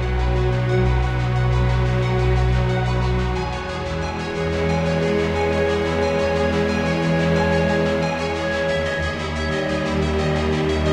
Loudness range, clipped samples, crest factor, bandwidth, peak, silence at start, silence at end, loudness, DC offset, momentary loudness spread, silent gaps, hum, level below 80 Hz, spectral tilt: 2 LU; under 0.1%; 12 dB; 10.5 kHz; -8 dBFS; 0 s; 0 s; -21 LUFS; under 0.1%; 5 LU; none; none; -28 dBFS; -6.5 dB/octave